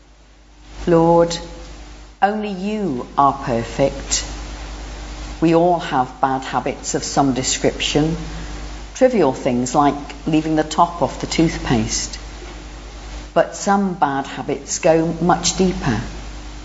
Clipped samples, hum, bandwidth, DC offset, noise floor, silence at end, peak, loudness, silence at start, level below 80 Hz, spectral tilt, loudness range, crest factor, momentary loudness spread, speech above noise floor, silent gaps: under 0.1%; 50 Hz at -35 dBFS; 8 kHz; under 0.1%; -47 dBFS; 0 s; -2 dBFS; -18 LUFS; 0.6 s; -34 dBFS; -4.5 dB/octave; 3 LU; 18 dB; 17 LU; 29 dB; none